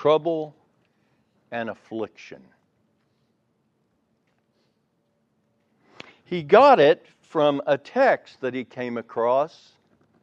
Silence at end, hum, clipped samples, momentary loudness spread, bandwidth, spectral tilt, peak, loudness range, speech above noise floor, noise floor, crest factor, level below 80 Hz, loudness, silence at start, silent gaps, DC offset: 0.75 s; none; under 0.1%; 18 LU; 7.6 kHz; -6.5 dB/octave; -2 dBFS; 19 LU; 49 dB; -70 dBFS; 22 dB; -72 dBFS; -22 LUFS; 0 s; none; under 0.1%